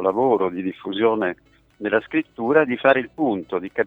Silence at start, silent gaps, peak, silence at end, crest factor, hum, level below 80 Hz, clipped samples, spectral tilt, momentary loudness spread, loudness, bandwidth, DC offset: 0 s; none; -2 dBFS; 0 s; 20 dB; none; -62 dBFS; under 0.1%; -8 dB/octave; 9 LU; -21 LUFS; 4.1 kHz; under 0.1%